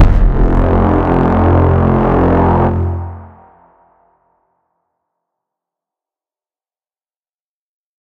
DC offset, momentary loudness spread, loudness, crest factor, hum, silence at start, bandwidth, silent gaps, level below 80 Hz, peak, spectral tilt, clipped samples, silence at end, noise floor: under 0.1%; 9 LU; -12 LUFS; 14 dB; none; 0 s; 4.5 kHz; none; -20 dBFS; 0 dBFS; -10.5 dB/octave; under 0.1%; 4.75 s; under -90 dBFS